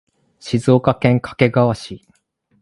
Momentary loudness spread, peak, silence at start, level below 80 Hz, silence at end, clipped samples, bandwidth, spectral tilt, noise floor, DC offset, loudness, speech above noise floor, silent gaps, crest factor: 20 LU; 0 dBFS; 0.45 s; -48 dBFS; 0.65 s; under 0.1%; 11.5 kHz; -7.5 dB/octave; -63 dBFS; under 0.1%; -17 LUFS; 47 dB; none; 18 dB